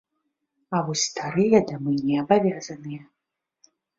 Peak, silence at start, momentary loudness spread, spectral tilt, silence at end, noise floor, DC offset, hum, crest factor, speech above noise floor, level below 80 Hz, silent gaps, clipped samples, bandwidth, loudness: -4 dBFS; 0.7 s; 16 LU; -5 dB/octave; 0.95 s; -79 dBFS; under 0.1%; none; 22 dB; 56 dB; -64 dBFS; none; under 0.1%; 7.8 kHz; -23 LUFS